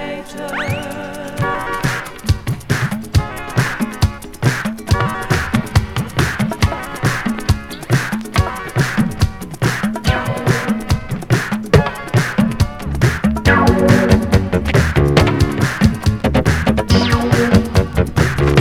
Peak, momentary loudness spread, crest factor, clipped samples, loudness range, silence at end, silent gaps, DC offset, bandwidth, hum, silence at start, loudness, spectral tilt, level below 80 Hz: 0 dBFS; 7 LU; 16 dB; under 0.1%; 5 LU; 0 s; none; 0.8%; 17 kHz; none; 0 s; -17 LUFS; -6 dB/octave; -26 dBFS